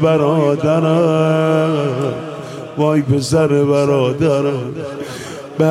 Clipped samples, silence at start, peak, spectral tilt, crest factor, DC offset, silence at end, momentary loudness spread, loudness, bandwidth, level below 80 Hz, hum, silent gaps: under 0.1%; 0 s; -2 dBFS; -7 dB/octave; 14 dB; under 0.1%; 0 s; 13 LU; -15 LUFS; 13 kHz; -52 dBFS; none; none